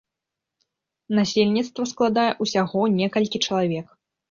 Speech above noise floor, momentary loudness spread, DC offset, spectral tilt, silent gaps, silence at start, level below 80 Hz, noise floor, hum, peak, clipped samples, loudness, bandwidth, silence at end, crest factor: 64 dB; 5 LU; under 0.1%; -5 dB/octave; none; 1.1 s; -64 dBFS; -85 dBFS; none; -6 dBFS; under 0.1%; -22 LUFS; 7.4 kHz; 0.45 s; 18 dB